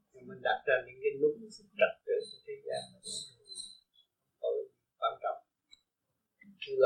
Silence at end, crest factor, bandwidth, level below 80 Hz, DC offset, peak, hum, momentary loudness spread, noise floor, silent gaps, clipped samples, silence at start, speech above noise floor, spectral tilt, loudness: 0 s; 24 dB; 10 kHz; -80 dBFS; under 0.1%; -12 dBFS; none; 15 LU; -85 dBFS; none; under 0.1%; 0.15 s; 51 dB; -2.5 dB/octave; -36 LUFS